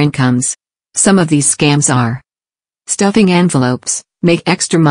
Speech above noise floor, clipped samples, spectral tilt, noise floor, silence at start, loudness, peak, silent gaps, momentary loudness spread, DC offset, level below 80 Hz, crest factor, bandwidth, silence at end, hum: over 79 dB; under 0.1%; -4.5 dB/octave; under -90 dBFS; 0 s; -12 LUFS; 0 dBFS; none; 9 LU; under 0.1%; -48 dBFS; 12 dB; 10.5 kHz; 0 s; none